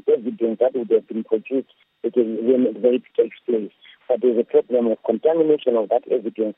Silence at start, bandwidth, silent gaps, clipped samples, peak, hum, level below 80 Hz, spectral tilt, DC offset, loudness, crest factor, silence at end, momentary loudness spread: 0.05 s; 3.8 kHz; none; under 0.1%; -4 dBFS; none; -82 dBFS; -10.5 dB/octave; under 0.1%; -21 LUFS; 16 dB; 0.05 s; 7 LU